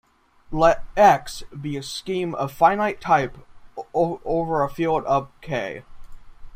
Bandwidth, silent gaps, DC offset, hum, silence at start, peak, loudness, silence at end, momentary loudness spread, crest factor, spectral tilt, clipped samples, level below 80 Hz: 15.5 kHz; none; under 0.1%; none; 0.5 s; -2 dBFS; -22 LUFS; 0 s; 16 LU; 20 dB; -5.5 dB/octave; under 0.1%; -44 dBFS